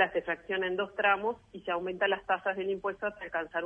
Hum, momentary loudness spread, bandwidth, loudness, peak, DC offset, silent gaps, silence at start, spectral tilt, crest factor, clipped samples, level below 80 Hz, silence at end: none; 8 LU; 5 kHz; -32 LUFS; -12 dBFS; under 0.1%; none; 0 s; -6 dB/octave; 18 dB; under 0.1%; -66 dBFS; 0 s